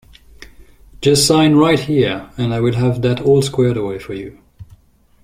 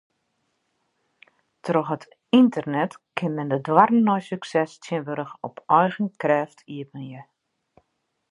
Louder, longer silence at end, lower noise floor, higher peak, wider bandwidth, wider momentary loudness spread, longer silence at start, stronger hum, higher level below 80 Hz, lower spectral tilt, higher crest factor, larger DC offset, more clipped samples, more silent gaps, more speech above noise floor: first, -15 LUFS vs -23 LUFS; second, 0.6 s vs 1.1 s; second, -50 dBFS vs -74 dBFS; about the same, -2 dBFS vs -2 dBFS; first, 16 kHz vs 10.5 kHz; second, 14 LU vs 18 LU; second, 0.4 s vs 1.65 s; neither; first, -44 dBFS vs -74 dBFS; second, -5.5 dB/octave vs -7 dB/octave; second, 16 dB vs 22 dB; neither; neither; neither; second, 35 dB vs 52 dB